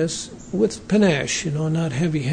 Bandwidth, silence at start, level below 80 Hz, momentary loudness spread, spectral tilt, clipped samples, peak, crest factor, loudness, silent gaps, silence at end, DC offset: 9.6 kHz; 0 s; -48 dBFS; 8 LU; -5 dB/octave; under 0.1%; -6 dBFS; 14 dB; -22 LUFS; none; 0 s; under 0.1%